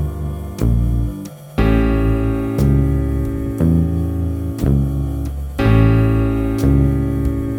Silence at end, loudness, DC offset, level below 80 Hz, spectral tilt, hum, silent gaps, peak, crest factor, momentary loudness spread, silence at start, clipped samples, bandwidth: 0 s; -18 LUFS; under 0.1%; -22 dBFS; -8.5 dB/octave; none; none; -2 dBFS; 14 dB; 9 LU; 0 s; under 0.1%; 16.5 kHz